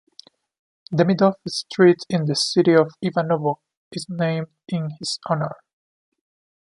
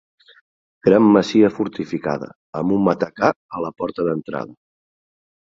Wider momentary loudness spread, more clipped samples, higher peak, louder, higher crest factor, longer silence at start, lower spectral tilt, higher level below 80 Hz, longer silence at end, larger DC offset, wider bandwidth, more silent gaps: about the same, 13 LU vs 15 LU; neither; about the same, -2 dBFS vs -2 dBFS; about the same, -21 LUFS vs -19 LUFS; about the same, 20 dB vs 18 dB; about the same, 0.9 s vs 0.85 s; second, -5.5 dB/octave vs -7.5 dB/octave; second, -66 dBFS vs -56 dBFS; about the same, 1.05 s vs 1.05 s; neither; first, 11.5 kHz vs 7.6 kHz; second, 3.77-3.91 s vs 2.36-2.53 s, 3.36-3.49 s